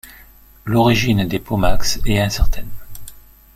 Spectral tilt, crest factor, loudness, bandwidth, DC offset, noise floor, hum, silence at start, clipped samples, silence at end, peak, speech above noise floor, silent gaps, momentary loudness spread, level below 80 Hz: -5 dB/octave; 14 dB; -18 LUFS; 16 kHz; under 0.1%; -45 dBFS; none; 0.05 s; under 0.1%; 0.4 s; -2 dBFS; 31 dB; none; 23 LU; -24 dBFS